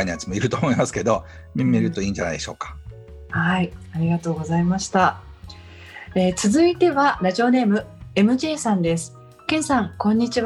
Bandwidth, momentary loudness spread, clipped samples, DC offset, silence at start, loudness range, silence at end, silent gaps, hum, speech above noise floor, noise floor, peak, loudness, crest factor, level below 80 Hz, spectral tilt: 12 kHz; 17 LU; under 0.1%; under 0.1%; 0 s; 4 LU; 0 s; none; none; 20 dB; -41 dBFS; -4 dBFS; -21 LUFS; 18 dB; -46 dBFS; -5.5 dB/octave